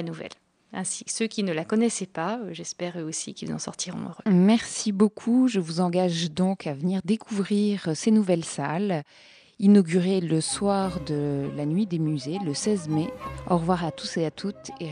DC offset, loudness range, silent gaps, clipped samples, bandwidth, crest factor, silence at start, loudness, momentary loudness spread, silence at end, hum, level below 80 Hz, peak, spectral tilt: under 0.1%; 5 LU; none; under 0.1%; 10.5 kHz; 18 dB; 0 s; -25 LUFS; 11 LU; 0 s; none; -56 dBFS; -8 dBFS; -5.5 dB/octave